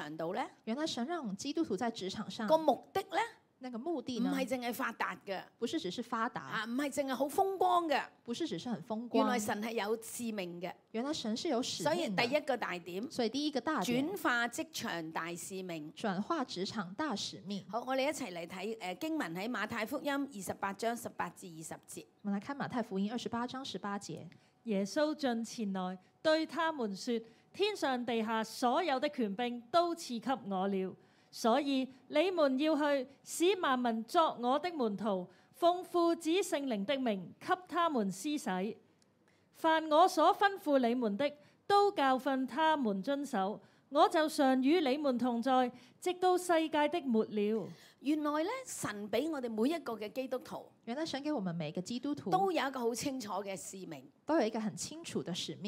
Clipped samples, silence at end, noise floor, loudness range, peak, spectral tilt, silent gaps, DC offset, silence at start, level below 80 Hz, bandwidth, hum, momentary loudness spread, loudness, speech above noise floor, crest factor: under 0.1%; 0 s; -70 dBFS; 6 LU; -14 dBFS; -4.5 dB/octave; none; under 0.1%; 0 s; -82 dBFS; 16 kHz; none; 11 LU; -35 LUFS; 36 dB; 22 dB